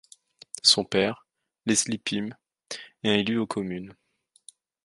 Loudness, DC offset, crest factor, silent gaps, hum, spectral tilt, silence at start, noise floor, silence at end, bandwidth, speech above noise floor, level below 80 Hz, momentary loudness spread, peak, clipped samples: -25 LUFS; under 0.1%; 24 dB; none; none; -3 dB/octave; 0.65 s; -55 dBFS; 0.95 s; 11.5 kHz; 30 dB; -64 dBFS; 19 LU; -6 dBFS; under 0.1%